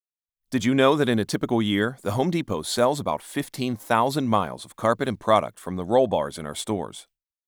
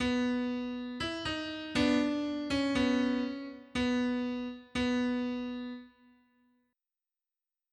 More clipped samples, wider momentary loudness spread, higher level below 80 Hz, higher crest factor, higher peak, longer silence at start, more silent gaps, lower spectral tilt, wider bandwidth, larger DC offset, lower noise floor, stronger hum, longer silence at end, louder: neither; about the same, 11 LU vs 10 LU; about the same, -58 dBFS vs -58 dBFS; about the same, 18 dB vs 18 dB; first, -6 dBFS vs -14 dBFS; first, 0.5 s vs 0 s; neither; about the same, -5.5 dB/octave vs -5 dB/octave; first, over 20 kHz vs 10.5 kHz; neither; second, -84 dBFS vs under -90 dBFS; neither; second, 0.45 s vs 1.85 s; first, -24 LUFS vs -33 LUFS